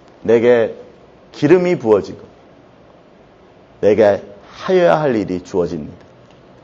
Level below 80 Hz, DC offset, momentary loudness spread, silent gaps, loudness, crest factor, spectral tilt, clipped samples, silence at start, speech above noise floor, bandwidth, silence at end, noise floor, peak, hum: -54 dBFS; under 0.1%; 19 LU; none; -15 LUFS; 16 dB; -7 dB/octave; under 0.1%; 0.25 s; 32 dB; 7.6 kHz; 0.7 s; -46 dBFS; 0 dBFS; none